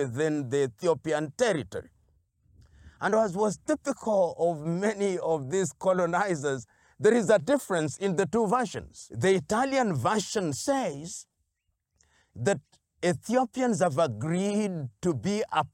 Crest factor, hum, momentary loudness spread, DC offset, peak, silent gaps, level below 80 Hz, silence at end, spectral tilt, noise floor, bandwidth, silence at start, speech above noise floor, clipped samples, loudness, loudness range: 16 dB; none; 7 LU; under 0.1%; -12 dBFS; none; -64 dBFS; 0.05 s; -5.5 dB/octave; -79 dBFS; 16.5 kHz; 0 s; 52 dB; under 0.1%; -28 LUFS; 4 LU